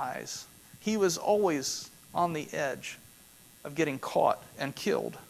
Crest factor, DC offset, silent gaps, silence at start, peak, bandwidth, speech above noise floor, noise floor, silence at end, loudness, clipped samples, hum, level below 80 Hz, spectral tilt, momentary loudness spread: 20 dB; under 0.1%; none; 0 s; -12 dBFS; 16 kHz; 25 dB; -56 dBFS; 0.05 s; -31 LUFS; under 0.1%; none; -68 dBFS; -4 dB/octave; 14 LU